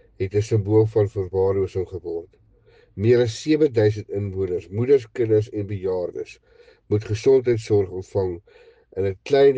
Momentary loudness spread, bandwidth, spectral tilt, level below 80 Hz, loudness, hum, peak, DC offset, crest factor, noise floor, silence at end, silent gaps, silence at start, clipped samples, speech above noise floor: 12 LU; 8.8 kHz; -7.5 dB/octave; -54 dBFS; -22 LUFS; none; -6 dBFS; under 0.1%; 16 dB; -55 dBFS; 0 s; none; 0.2 s; under 0.1%; 34 dB